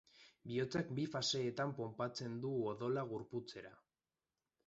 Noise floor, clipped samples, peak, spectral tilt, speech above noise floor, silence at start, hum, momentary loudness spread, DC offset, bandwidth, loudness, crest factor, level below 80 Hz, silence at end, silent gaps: under -90 dBFS; under 0.1%; -26 dBFS; -4.5 dB/octave; over 49 dB; 0.15 s; none; 12 LU; under 0.1%; 8 kHz; -41 LUFS; 16 dB; -78 dBFS; 0.9 s; none